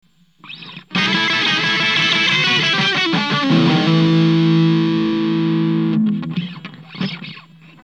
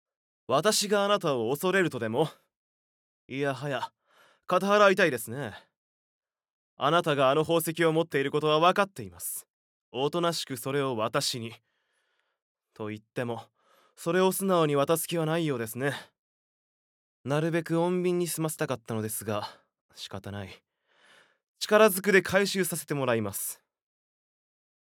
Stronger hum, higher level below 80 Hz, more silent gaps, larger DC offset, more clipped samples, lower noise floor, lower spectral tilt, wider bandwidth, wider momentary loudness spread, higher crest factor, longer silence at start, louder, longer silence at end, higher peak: neither; first, -56 dBFS vs -76 dBFS; second, none vs 2.56-3.29 s, 5.77-6.20 s, 6.50-6.77 s, 9.50-9.92 s, 12.42-12.55 s, 16.19-17.24 s, 19.81-19.89 s, 21.48-21.55 s; first, 0.1% vs under 0.1%; neither; second, -41 dBFS vs -75 dBFS; about the same, -5.5 dB/octave vs -4.5 dB/octave; second, 7.8 kHz vs over 20 kHz; about the same, 18 LU vs 16 LU; second, 14 dB vs 22 dB; about the same, 0.45 s vs 0.5 s; first, -15 LUFS vs -27 LUFS; second, 0.45 s vs 1.45 s; first, -4 dBFS vs -8 dBFS